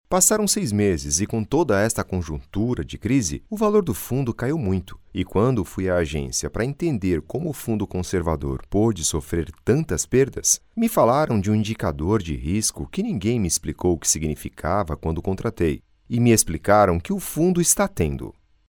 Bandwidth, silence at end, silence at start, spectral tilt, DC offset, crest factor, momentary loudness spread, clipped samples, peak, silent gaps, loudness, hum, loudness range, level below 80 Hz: 19.5 kHz; 0.45 s; 0.1 s; -5 dB/octave; under 0.1%; 20 dB; 9 LU; under 0.1%; -2 dBFS; none; -22 LUFS; none; 4 LU; -40 dBFS